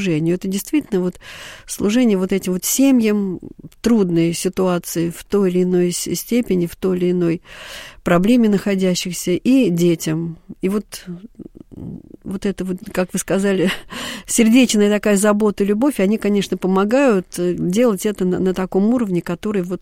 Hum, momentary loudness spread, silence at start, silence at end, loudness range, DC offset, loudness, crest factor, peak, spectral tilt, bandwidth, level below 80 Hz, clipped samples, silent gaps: none; 15 LU; 0 s; 0.05 s; 6 LU; 0.2%; -18 LUFS; 16 dB; -2 dBFS; -5.5 dB/octave; 16.5 kHz; -46 dBFS; under 0.1%; none